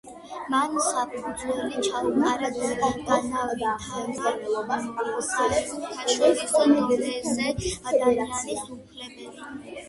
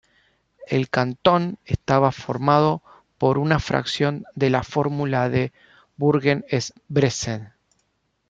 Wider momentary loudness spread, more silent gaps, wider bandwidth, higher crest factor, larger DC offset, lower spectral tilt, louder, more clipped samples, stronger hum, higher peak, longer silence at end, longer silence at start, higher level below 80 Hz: first, 17 LU vs 7 LU; neither; first, 12 kHz vs 7.8 kHz; about the same, 18 dB vs 20 dB; neither; second, -3.5 dB/octave vs -6 dB/octave; second, -25 LUFS vs -22 LUFS; neither; neither; second, -6 dBFS vs -2 dBFS; second, 0 s vs 0.8 s; second, 0.05 s vs 0.6 s; about the same, -52 dBFS vs -48 dBFS